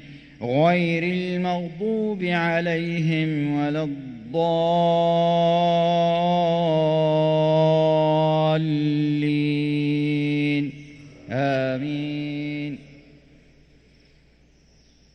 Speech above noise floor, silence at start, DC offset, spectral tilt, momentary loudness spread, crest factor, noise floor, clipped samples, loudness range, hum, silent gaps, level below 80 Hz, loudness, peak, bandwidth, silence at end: 35 dB; 0.05 s; under 0.1%; -8 dB/octave; 9 LU; 14 dB; -56 dBFS; under 0.1%; 9 LU; none; none; -58 dBFS; -22 LUFS; -8 dBFS; 8.4 kHz; 2.2 s